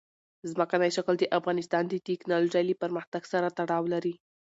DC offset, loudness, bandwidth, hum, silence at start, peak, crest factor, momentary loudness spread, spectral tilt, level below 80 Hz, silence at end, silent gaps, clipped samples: under 0.1%; -29 LUFS; 8 kHz; none; 0.45 s; -12 dBFS; 18 dB; 7 LU; -5.5 dB/octave; -78 dBFS; 0.35 s; 3.07-3.12 s; under 0.1%